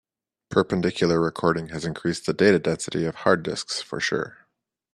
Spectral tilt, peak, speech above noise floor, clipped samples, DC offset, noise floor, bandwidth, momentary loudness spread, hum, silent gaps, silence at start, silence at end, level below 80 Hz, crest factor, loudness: -5 dB/octave; -2 dBFS; 48 dB; under 0.1%; under 0.1%; -72 dBFS; 12 kHz; 9 LU; none; none; 0.5 s; 0.6 s; -58 dBFS; 22 dB; -24 LUFS